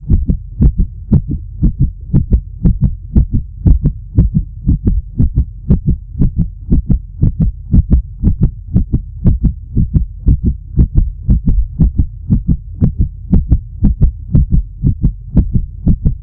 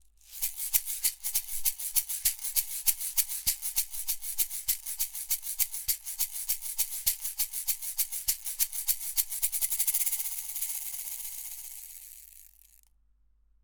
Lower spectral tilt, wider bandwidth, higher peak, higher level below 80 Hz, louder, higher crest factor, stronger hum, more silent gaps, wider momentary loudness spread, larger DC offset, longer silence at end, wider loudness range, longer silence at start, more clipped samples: first, -14.5 dB/octave vs 3.5 dB/octave; second, 1.6 kHz vs over 20 kHz; first, 0 dBFS vs -6 dBFS; first, -14 dBFS vs -56 dBFS; first, -15 LUFS vs -29 LUFS; second, 12 dB vs 26 dB; neither; neither; second, 4 LU vs 9 LU; neither; second, 0 s vs 1.15 s; about the same, 1 LU vs 3 LU; second, 0 s vs 0.25 s; first, 0.6% vs under 0.1%